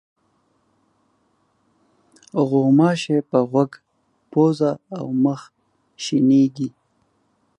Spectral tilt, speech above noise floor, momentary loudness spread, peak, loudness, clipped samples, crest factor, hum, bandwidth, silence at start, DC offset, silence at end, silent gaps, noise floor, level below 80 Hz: -7 dB/octave; 47 dB; 14 LU; -2 dBFS; -20 LUFS; under 0.1%; 18 dB; none; 9.4 kHz; 2.35 s; under 0.1%; 0.9 s; none; -65 dBFS; -70 dBFS